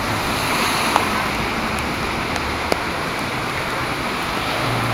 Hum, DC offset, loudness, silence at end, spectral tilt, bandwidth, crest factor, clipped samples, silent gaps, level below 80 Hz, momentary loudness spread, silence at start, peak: none; under 0.1%; -21 LUFS; 0 s; -3.5 dB/octave; 16 kHz; 22 dB; under 0.1%; none; -38 dBFS; 5 LU; 0 s; 0 dBFS